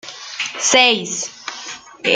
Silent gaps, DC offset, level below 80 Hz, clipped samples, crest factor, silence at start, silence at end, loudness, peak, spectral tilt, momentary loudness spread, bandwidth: none; under 0.1%; -68 dBFS; under 0.1%; 18 dB; 0.05 s; 0 s; -16 LUFS; -2 dBFS; -0.5 dB/octave; 18 LU; 10.5 kHz